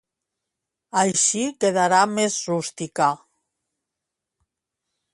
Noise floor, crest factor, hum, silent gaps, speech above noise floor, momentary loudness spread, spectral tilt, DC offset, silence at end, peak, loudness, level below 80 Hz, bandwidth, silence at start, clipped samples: -84 dBFS; 20 dB; none; none; 63 dB; 9 LU; -3 dB/octave; under 0.1%; 1.95 s; -4 dBFS; -21 LUFS; -70 dBFS; 11.5 kHz; 0.95 s; under 0.1%